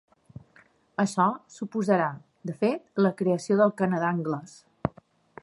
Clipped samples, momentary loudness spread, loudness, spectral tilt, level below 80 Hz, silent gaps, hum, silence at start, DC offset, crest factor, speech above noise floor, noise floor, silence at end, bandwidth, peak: under 0.1%; 12 LU; -27 LUFS; -7 dB/octave; -62 dBFS; none; none; 1 s; under 0.1%; 20 dB; 34 dB; -60 dBFS; 0.55 s; 11.5 kHz; -6 dBFS